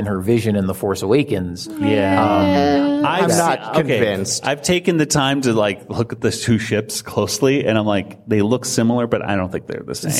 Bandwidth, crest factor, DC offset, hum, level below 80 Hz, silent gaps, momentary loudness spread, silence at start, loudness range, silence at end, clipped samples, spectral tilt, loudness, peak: 16 kHz; 16 dB; under 0.1%; none; -50 dBFS; none; 7 LU; 0 s; 2 LU; 0 s; under 0.1%; -5 dB/octave; -18 LUFS; -2 dBFS